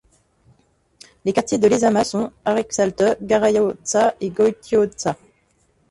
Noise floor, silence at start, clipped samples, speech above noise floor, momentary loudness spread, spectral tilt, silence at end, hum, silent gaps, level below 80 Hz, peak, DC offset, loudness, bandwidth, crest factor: -62 dBFS; 1.25 s; under 0.1%; 43 dB; 7 LU; -4.5 dB/octave; 0.75 s; none; none; -54 dBFS; -4 dBFS; under 0.1%; -19 LUFS; 11.5 kHz; 16 dB